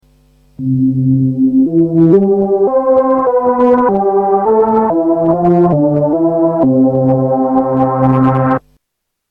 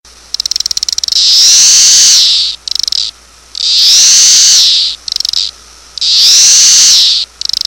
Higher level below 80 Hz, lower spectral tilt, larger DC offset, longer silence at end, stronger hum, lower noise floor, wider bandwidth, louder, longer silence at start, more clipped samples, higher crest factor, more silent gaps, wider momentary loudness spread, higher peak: about the same, -46 dBFS vs -46 dBFS; first, -12 dB/octave vs 4.5 dB/octave; second, under 0.1% vs 0.3%; first, 0.75 s vs 0.4 s; neither; first, -73 dBFS vs -30 dBFS; second, 3.5 kHz vs over 20 kHz; second, -11 LUFS vs -4 LUFS; second, 0.6 s vs 1.1 s; second, under 0.1% vs 1%; about the same, 10 dB vs 8 dB; neither; second, 3 LU vs 12 LU; about the same, 0 dBFS vs 0 dBFS